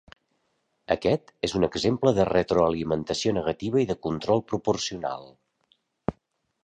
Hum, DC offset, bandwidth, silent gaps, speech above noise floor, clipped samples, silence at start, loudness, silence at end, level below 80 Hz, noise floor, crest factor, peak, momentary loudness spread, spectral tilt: none; under 0.1%; 10 kHz; none; 49 dB; under 0.1%; 0.9 s; -26 LUFS; 0.55 s; -50 dBFS; -74 dBFS; 20 dB; -6 dBFS; 11 LU; -5.5 dB/octave